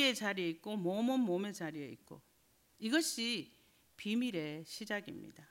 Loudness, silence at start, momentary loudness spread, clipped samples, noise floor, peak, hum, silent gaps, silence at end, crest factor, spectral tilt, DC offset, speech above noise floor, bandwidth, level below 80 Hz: -37 LUFS; 0 s; 17 LU; under 0.1%; -72 dBFS; -18 dBFS; none; none; 0.05 s; 20 dB; -3.5 dB/octave; under 0.1%; 34 dB; 16 kHz; -82 dBFS